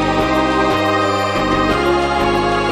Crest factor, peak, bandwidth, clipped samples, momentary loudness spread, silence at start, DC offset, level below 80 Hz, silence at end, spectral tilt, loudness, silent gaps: 14 dB; -2 dBFS; 14.5 kHz; under 0.1%; 1 LU; 0 s; under 0.1%; -32 dBFS; 0 s; -5.5 dB/octave; -15 LUFS; none